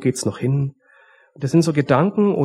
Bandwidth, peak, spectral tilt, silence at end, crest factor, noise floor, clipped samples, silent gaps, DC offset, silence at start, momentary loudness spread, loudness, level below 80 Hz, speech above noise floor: 14.5 kHz; -2 dBFS; -6.5 dB/octave; 0 s; 18 dB; -53 dBFS; under 0.1%; none; under 0.1%; 0 s; 8 LU; -19 LUFS; -58 dBFS; 35 dB